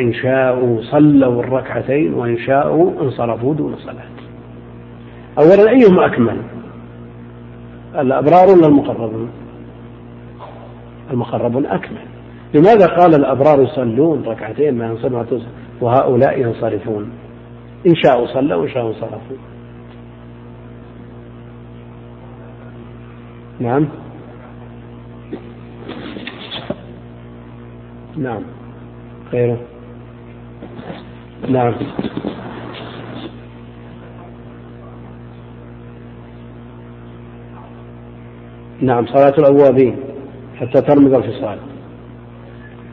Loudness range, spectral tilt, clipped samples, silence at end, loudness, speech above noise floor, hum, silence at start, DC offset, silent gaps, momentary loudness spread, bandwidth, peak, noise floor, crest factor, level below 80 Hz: 22 LU; -9.5 dB/octave; under 0.1%; 0 s; -14 LUFS; 22 dB; 60 Hz at -45 dBFS; 0 s; under 0.1%; none; 26 LU; 6 kHz; 0 dBFS; -35 dBFS; 16 dB; -46 dBFS